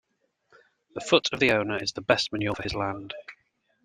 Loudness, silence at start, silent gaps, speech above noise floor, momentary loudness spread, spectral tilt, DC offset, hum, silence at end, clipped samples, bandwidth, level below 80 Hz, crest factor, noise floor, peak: -25 LUFS; 0.95 s; none; 44 dB; 16 LU; -4 dB/octave; under 0.1%; none; 0.5 s; under 0.1%; 14 kHz; -56 dBFS; 24 dB; -70 dBFS; -4 dBFS